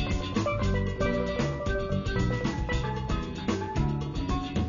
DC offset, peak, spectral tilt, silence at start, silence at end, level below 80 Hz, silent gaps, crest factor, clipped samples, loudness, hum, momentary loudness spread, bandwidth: under 0.1%; -16 dBFS; -6.5 dB/octave; 0 s; 0 s; -36 dBFS; none; 14 dB; under 0.1%; -30 LUFS; none; 3 LU; 7.4 kHz